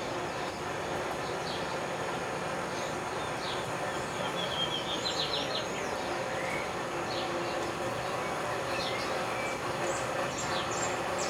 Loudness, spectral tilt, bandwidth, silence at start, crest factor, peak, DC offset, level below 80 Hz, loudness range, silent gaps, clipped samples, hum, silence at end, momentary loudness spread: -33 LUFS; -3 dB/octave; 17.5 kHz; 0 s; 14 dB; -18 dBFS; under 0.1%; -58 dBFS; 2 LU; none; under 0.1%; none; 0 s; 4 LU